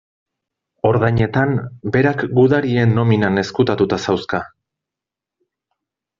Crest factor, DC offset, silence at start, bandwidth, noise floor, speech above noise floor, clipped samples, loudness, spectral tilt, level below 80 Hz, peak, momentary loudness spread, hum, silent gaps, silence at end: 16 dB; under 0.1%; 0.85 s; 7.4 kHz; -86 dBFS; 70 dB; under 0.1%; -17 LUFS; -6.5 dB/octave; -48 dBFS; -2 dBFS; 7 LU; none; none; 1.7 s